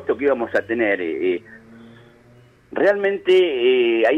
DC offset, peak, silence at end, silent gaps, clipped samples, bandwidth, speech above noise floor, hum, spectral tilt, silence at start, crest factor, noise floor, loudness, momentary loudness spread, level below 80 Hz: under 0.1%; -6 dBFS; 0 s; none; under 0.1%; 6.8 kHz; 32 dB; none; -6 dB/octave; 0 s; 14 dB; -51 dBFS; -19 LUFS; 7 LU; -62 dBFS